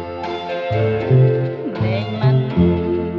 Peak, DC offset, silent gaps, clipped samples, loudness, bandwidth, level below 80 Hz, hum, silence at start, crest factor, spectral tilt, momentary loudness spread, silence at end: -2 dBFS; under 0.1%; none; under 0.1%; -18 LUFS; 5.6 kHz; -40 dBFS; none; 0 s; 14 dB; -9.5 dB/octave; 10 LU; 0 s